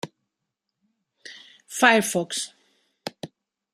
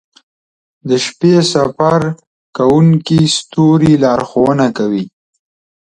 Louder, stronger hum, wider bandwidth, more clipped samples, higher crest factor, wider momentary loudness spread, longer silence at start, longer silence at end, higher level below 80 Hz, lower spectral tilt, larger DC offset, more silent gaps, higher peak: second, -21 LUFS vs -12 LUFS; neither; first, 15.5 kHz vs 10 kHz; neither; first, 26 dB vs 12 dB; first, 25 LU vs 11 LU; second, 0.05 s vs 0.85 s; second, 0.45 s vs 0.85 s; second, -76 dBFS vs -48 dBFS; second, -2.5 dB/octave vs -6 dB/octave; neither; second, none vs 2.27-2.53 s; about the same, 0 dBFS vs 0 dBFS